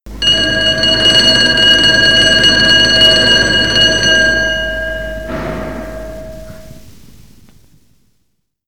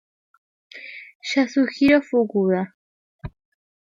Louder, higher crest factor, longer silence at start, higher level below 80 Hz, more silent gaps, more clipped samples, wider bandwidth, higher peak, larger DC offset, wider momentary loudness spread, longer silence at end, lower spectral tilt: first, -8 LUFS vs -20 LUFS; second, 12 dB vs 20 dB; second, 0.05 s vs 0.75 s; first, -30 dBFS vs -54 dBFS; second, none vs 1.15-1.20 s, 2.74-3.19 s; neither; first, over 20 kHz vs 7.6 kHz; first, 0 dBFS vs -4 dBFS; first, 1% vs under 0.1%; second, 17 LU vs 23 LU; first, 1.95 s vs 0.65 s; second, -2 dB/octave vs -6 dB/octave